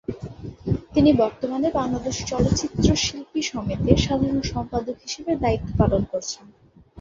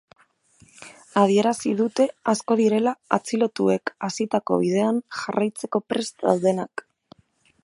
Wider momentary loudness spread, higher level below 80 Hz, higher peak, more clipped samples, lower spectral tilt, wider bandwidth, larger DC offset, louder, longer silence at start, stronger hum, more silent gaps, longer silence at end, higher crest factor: first, 12 LU vs 8 LU; first, -36 dBFS vs -70 dBFS; about the same, 0 dBFS vs -2 dBFS; neither; about the same, -5.5 dB/octave vs -5.5 dB/octave; second, 7.8 kHz vs 11.5 kHz; neither; about the same, -23 LUFS vs -23 LUFS; second, 0.1 s vs 0.8 s; neither; neither; second, 0 s vs 0.85 s; about the same, 22 dB vs 22 dB